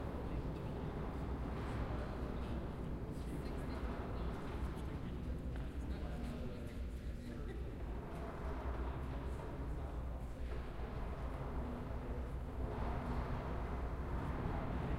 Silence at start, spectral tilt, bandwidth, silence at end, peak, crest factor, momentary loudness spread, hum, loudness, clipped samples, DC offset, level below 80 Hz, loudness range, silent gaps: 0 s; -8 dB/octave; 13 kHz; 0 s; -26 dBFS; 16 dB; 4 LU; none; -45 LUFS; under 0.1%; under 0.1%; -44 dBFS; 2 LU; none